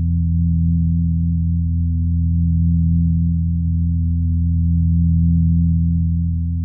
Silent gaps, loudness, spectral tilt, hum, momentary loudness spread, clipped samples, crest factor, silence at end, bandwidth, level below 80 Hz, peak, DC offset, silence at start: none; -18 LUFS; -30.5 dB/octave; none; 4 LU; under 0.1%; 8 dB; 0 s; 0.3 kHz; -24 dBFS; -8 dBFS; under 0.1%; 0 s